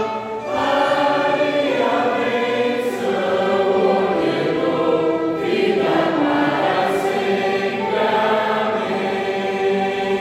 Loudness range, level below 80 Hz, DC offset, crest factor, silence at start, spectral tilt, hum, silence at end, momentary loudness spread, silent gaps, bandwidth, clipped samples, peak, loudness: 1 LU; -58 dBFS; under 0.1%; 14 dB; 0 s; -5.5 dB/octave; none; 0 s; 4 LU; none; 14.5 kHz; under 0.1%; -4 dBFS; -19 LUFS